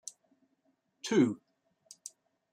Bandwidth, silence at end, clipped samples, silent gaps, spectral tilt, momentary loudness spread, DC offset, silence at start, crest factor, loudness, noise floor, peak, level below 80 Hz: 14.5 kHz; 0.45 s; under 0.1%; none; -5 dB/octave; 20 LU; under 0.1%; 1.05 s; 22 dB; -30 LUFS; -76 dBFS; -14 dBFS; -82 dBFS